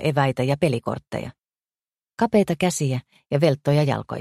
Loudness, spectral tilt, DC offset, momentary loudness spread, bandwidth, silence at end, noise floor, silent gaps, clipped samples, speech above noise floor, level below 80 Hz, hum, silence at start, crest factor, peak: -22 LUFS; -6 dB/octave; under 0.1%; 12 LU; 13.5 kHz; 0 s; under -90 dBFS; none; under 0.1%; over 68 dB; -56 dBFS; none; 0 s; 18 dB; -4 dBFS